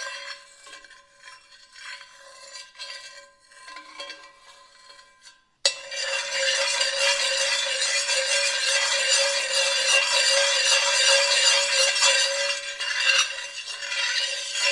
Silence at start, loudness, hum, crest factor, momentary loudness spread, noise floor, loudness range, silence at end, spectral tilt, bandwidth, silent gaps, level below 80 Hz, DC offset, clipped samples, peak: 0 s; -20 LUFS; none; 22 dB; 21 LU; -54 dBFS; 23 LU; 0 s; 4.5 dB/octave; 11.5 kHz; none; -72 dBFS; under 0.1%; under 0.1%; -4 dBFS